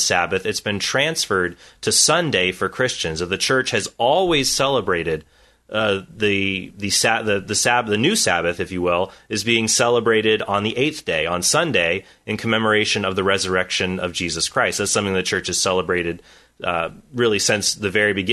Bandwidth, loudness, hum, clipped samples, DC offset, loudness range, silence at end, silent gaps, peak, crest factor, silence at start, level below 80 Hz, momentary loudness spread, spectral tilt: 12.5 kHz; -19 LUFS; none; under 0.1%; under 0.1%; 2 LU; 0 s; none; -2 dBFS; 18 dB; 0 s; -50 dBFS; 7 LU; -2.5 dB/octave